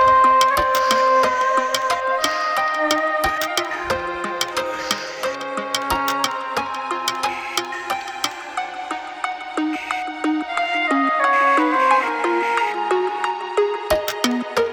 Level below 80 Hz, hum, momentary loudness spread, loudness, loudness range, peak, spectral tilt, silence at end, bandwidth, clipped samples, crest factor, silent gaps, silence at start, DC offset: -48 dBFS; none; 10 LU; -20 LUFS; 6 LU; -2 dBFS; -2.5 dB/octave; 0 s; over 20 kHz; under 0.1%; 18 dB; none; 0 s; under 0.1%